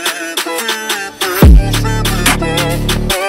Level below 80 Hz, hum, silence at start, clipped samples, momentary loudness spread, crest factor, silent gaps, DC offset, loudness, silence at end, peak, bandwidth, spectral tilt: -14 dBFS; none; 0 s; under 0.1%; 9 LU; 12 dB; none; under 0.1%; -13 LUFS; 0 s; 0 dBFS; 16.5 kHz; -4 dB/octave